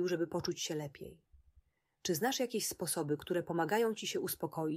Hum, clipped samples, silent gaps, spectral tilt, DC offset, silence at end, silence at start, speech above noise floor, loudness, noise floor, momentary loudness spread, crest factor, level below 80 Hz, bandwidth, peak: none; under 0.1%; none; -4 dB/octave; under 0.1%; 0 s; 0 s; 35 dB; -36 LUFS; -71 dBFS; 9 LU; 16 dB; -70 dBFS; 16 kHz; -20 dBFS